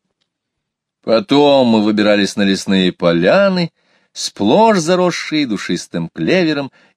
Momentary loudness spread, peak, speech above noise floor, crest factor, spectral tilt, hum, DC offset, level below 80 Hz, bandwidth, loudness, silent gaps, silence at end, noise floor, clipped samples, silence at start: 12 LU; 0 dBFS; 64 dB; 14 dB; -5 dB/octave; none; under 0.1%; -58 dBFS; 13.5 kHz; -14 LUFS; none; 0.3 s; -77 dBFS; under 0.1%; 1.05 s